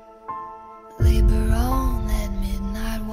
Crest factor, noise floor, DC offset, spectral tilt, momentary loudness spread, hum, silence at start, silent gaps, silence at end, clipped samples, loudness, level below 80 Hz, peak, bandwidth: 16 dB; -41 dBFS; under 0.1%; -7 dB/octave; 16 LU; none; 0.1 s; none; 0 s; under 0.1%; -24 LUFS; -22 dBFS; -6 dBFS; 15.5 kHz